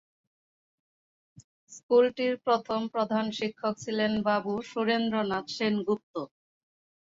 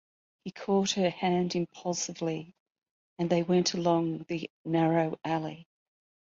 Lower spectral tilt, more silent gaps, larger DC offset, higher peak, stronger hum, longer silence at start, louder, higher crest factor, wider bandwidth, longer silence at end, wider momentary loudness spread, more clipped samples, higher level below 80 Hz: about the same, -5 dB/octave vs -5 dB/octave; second, 1.44-1.67 s, 1.83-1.89 s, 6.03-6.14 s vs 2.60-2.66 s, 2.91-3.17 s, 4.50-4.65 s; neither; about the same, -12 dBFS vs -12 dBFS; neither; first, 1.4 s vs 0.45 s; about the same, -28 LUFS vs -30 LUFS; about the same, 18 dB vs 18 dB; about the same, 7.8 kHz vs 7.8 kHz; first, 0.75 s vs 0.6 s; second, 8 LU vs 13 LU; neither; about the same, -70 dBFS vs -70 dBFS